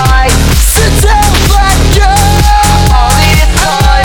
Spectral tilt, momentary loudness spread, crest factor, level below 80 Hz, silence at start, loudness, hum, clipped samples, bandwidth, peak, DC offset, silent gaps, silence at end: -4 dB/octave; 1 LU; 6 dB; -8 dBFS; 0 s; -7 LUFS; none; 3%; 19 kHz; 0 dBFS; under 0.1%; none; 0 s